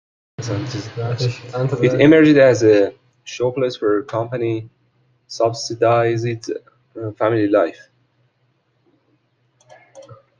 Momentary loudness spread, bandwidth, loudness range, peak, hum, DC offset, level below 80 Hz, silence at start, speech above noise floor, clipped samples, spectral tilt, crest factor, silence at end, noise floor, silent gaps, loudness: 16 LU; 7.6 kHz; 8 LU; -2 dBFS; none; under 0.1%; -58 dBFS; 0.4 s; 48 dB; under 0.1%; -6.5 dB/octave; 18 dB; 0.25 s; -64 dBFS; none; -17 LUFS